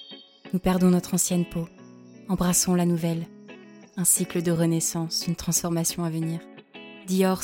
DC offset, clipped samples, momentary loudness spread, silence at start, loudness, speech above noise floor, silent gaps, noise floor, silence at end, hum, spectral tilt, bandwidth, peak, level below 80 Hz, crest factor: under 0.1%; under 0.1%; 20 LU; 0 s; -24 LUFS; 23 dB; none; -47 dBFS; 0 s; none; -4.5 dB/octave; 17 kHz; -6 dBFS; -50 dBFS; 18 dB